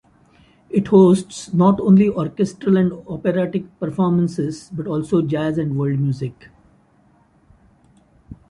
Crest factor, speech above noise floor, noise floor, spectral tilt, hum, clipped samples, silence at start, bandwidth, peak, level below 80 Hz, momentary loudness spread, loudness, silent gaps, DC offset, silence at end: 18 dB; 38 dB; -56 dBFS; -8 dB/octave; none; under 0.1%; 0.7 s; 11 kHz; -2 dBFS; -52 dBFS; 12 LU; -18 LUFS; none; under 0.1%; 0.15 s